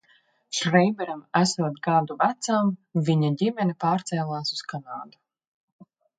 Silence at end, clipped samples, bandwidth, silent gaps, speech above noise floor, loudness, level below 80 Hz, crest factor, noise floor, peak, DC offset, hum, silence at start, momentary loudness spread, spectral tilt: 1.1 s; under 0.1%; 9.4 kHz; none; 39 dB; -25 LUFS; -70 dBFS; 20 dB; -63 dBFS; -6 dBFS; under 0.1%; none; 0.5 s; 11 LU; -5.5 dB/octave